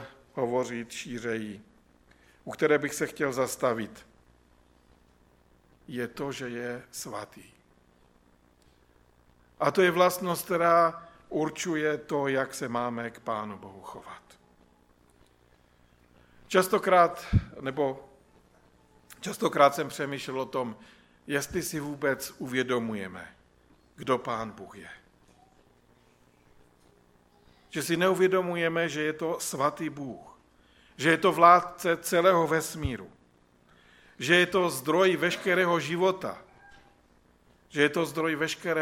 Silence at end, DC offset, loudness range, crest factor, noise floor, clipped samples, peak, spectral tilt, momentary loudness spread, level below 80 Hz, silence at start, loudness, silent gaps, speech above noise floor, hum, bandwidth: 0 s; under 0.1%; 14 LU; 24 dB; -63 dBFS; under 0.1%; -4 dBFS; -4.5 dB/octave; 18 LU; -54 dBFS; 0 s; -27 LUFS; none; 35 dB; none; 17 kHz